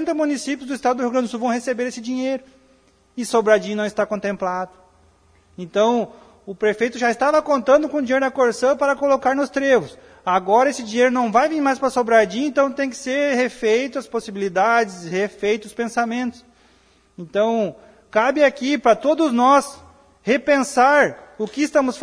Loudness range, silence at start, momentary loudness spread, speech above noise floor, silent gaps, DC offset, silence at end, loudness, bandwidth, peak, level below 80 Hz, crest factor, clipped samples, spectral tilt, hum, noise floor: 5 LU; 0 s; 10 LU; 37 dB; none; under 0.1%; 0 s; -19 LUFS; 11 kHz; -2 dBFS; -60 dBFS; 16 dB; under 0.1%; -4.5 dB/octave; none; -56 dBFS